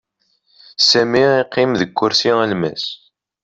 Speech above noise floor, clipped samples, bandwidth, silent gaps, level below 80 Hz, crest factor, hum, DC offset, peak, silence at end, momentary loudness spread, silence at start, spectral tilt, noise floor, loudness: 48 dB; under 0.1%; 7.8 kHz; none; -58 dBFS; 16 dB; none; under 0.1%; -2 dBFS; 0.5 s; 13 LU; 0.8 s; -4 dB/octave; -63 dBFS; -15 LUFS